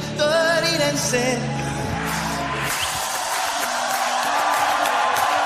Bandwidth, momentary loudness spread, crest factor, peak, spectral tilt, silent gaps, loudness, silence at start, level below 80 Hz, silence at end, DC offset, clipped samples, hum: 15.5 kHz; 6 LU; 16 dB; -6 dBFS; -3 dB/octave; none; -21 LUFS; 0 s; -46 dBFS; 0 s; under 0.1%; under 0.1%; none